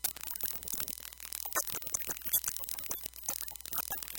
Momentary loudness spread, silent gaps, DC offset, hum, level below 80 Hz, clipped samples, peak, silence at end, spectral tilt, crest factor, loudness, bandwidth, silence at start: 7 LU; none; under 0.1%; none; -60 dBFS; under 0.1%; -12 dBFS; 0 s; 0 dB/octave; 26 dB; -35 LUFS; 17.5 kHz; 0 s